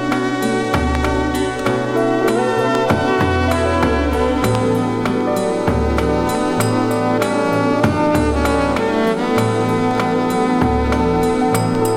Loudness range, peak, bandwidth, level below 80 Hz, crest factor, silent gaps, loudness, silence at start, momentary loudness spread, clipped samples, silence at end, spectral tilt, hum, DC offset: 1 LU; 0 dBFS; 16.5 kHz; -30 dBFS; 16 dB; none; -17 LUFS; 0 s; 2 LU; under 0.1%; 0 s; -6 dB/octave; none; under 0.1%